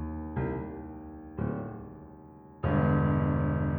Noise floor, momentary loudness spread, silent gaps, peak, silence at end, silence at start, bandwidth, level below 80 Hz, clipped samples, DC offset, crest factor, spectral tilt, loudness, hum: -50 dBFS; 22 LU; none; -14 dBFS; 0 s; 0 s; 3.5 kHz; -44 dBFS; under 0.1%; under 0.1%; 16 dB; -12.5 dB/octave; -30 LUFS; none